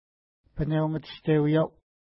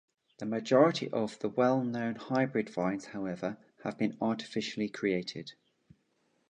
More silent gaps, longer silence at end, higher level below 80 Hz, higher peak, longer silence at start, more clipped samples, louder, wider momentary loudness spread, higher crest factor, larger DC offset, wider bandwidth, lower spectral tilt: neither; second, 0.45 s vs 1 s; first, -48 dBFS vs -74 dBFS; about the same, -12 dBFS vs -10 dBFS; first, 0.55 s vs 0.4 s; neither; first, -27 LUFS vs -32 LUFS; second, 10 LU vs 14 LU; second, 16 dB vs 22 dB; neither; second, 5.8 kHz vs 9.8 kHz; first, -12 dB/octave vs -6 dB/octave